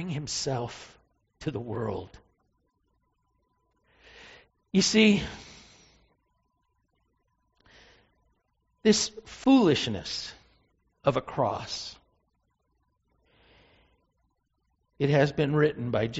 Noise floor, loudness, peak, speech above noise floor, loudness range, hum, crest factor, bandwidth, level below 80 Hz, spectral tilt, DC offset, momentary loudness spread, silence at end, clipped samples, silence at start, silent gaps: -75 dBFS; -26 LUFS; -8 dBFS; 49 dB; 13 LU; none; 22 dB; 8 kHz; -58 dBFS; -4.5 dB/octave; under 0.1%; 18 LU; 0 s; under 0.1%; 0 s; none